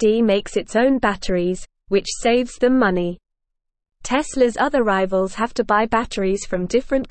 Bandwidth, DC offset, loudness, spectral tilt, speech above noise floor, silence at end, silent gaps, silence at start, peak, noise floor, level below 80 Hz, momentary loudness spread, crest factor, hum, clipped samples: 8.8 kHz; 0.5%; -20 LUFS; -5 dB/octave; 59 dB; 0 s; none; 0 s; -4 dBFS; -77 dBFS; -40 dBFS; 6 LU; 16 dB; none; under 0.1%